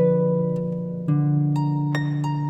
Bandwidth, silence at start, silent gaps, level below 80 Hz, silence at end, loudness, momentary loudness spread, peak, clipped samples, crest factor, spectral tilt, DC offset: 8 kHz; 0 s; none; -60 dBFS; 0 s; -23 LUFS; 6 LU; -10 dBFS; under 0.1%; 12 dB; -9.5 dB/octave; under 0.1%